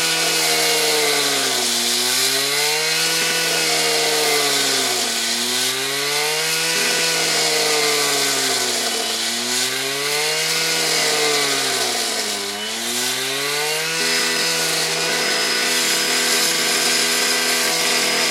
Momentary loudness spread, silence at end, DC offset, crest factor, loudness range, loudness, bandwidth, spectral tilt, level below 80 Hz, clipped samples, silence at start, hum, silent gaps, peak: 4 LU; 0 s; under 0.1%; 16 dB; 2 LU; -17 LUFS; 16 kHz; 0 dB/octave; -78 dBFS; under 0.1%; 0 s; none; none; -4 dBFS